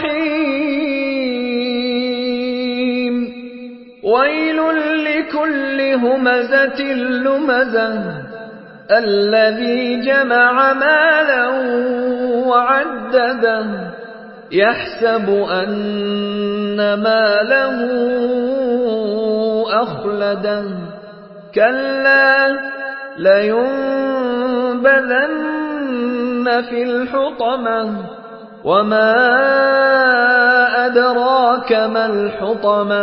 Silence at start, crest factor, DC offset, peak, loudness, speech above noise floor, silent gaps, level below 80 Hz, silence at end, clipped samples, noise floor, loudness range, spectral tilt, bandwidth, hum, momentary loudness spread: 0 s; 16 dB; under 0.1%; 0 dBFS; -15 LUFS; 21 dB; none; -58 dBFS; 0 s; under 0.1%; -36 dBFS; 5 LU; -10 dB/octave; 5.8 kHz; none; 11 LU